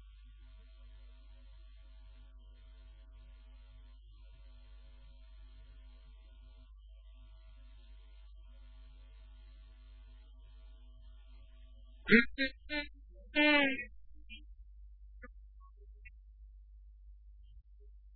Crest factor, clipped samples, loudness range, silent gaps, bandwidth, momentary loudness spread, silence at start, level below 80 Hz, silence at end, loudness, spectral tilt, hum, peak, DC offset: 32 dB; under 0.1%; 27 LU; none; 4.3 kHz; 27 LU; 0 s; -54 dBFS; 0 s; -31 LUFS; -2 dB/octave; none; -10 dBFS; under 0.1%